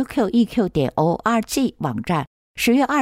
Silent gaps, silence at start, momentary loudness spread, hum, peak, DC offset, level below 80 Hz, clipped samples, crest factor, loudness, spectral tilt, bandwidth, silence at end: 2.27-2.55 s; 0 s; 6 LU; none; -8 dBFS; under 0.1%; -48 dBFS; under 0.1%; 12 dB; -20 LUFS; -5.5 dB/octave; 16 kHz; 0 s